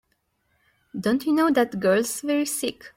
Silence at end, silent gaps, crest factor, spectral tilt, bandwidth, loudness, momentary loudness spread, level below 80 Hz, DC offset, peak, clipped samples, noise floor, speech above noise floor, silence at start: 0.1 s; none; 16 dB; -4 dB/octave; 16.5 kHz; -23 LUFS; 8 LU; -64 dBFS; under 0.1%; -8 dBFS; under 0.1%; -71 dBFS; 48 dB; 0.95 s